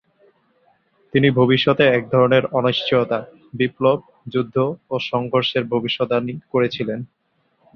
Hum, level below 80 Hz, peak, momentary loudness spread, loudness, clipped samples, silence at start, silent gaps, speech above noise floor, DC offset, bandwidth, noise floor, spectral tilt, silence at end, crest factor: none; -58 dBFS; -2 dBFS; 10 LU; -19 LUFS; under 0.1%; 1.15 s; none; 44 dB; under 0.1%; 6.4 kHz; -63 dBFS; -8 dB/octave; 0.7 s; 18 dB